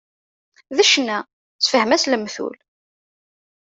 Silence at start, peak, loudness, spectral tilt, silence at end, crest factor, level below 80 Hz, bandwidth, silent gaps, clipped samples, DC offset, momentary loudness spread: 0.7 s; -2 dBFS; -18 LUFS; -1.5 dB/octave; 1.2 s; 20 dB; -68 dBFS; 8.2 kHz; 1.33-1.59 s; under 0.1%; under 0.1%; 14 LU